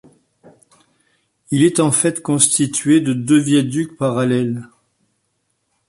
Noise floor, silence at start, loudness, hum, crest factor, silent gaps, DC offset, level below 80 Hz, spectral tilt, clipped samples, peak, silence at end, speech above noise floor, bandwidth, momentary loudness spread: -69 dBFS; 1.5 s; -16 LUFS; none; 18 dB; none; under 0.1%; -60 dBFS; -4.5 dB/octave; under 0.1%; 0 dBFS; 1.25 s; 53 dB; 11.5 kHz; 8 LU